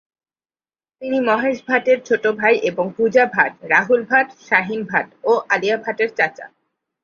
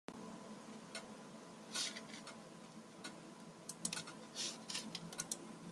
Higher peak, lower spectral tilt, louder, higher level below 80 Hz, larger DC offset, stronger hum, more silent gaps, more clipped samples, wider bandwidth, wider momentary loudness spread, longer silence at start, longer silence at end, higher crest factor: first, 0 dBFS vs -22 dBFS; first, -5 dB/octave vs -2 dB/octave; first, -18 LUFS vs -47 LUFS; first, -66 dBFS vs -84 dBFS; neither; neither; neither; neither; second, 7 kHz vs 13.5 kHz; second, 6 LU vs 13 LU; first, 1 s vs 0.1 s; first, 0.55 s vs 0 s; second, 18 dB vs 28 dB